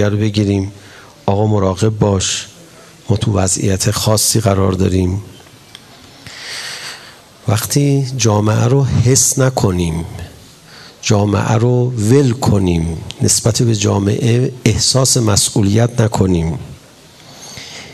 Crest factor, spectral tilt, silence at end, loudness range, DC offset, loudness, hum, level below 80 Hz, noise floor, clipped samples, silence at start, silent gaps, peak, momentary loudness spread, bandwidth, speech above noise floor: 14 dB; -5 dB/octave; 0 s; 4 LU; under 0.1%; -14 LUFS; none; -42 dBFS; -41 dBFS; under 0.1%; 0 s; none; 0 dBFS; 15 LU; 14 kHz; 28 dB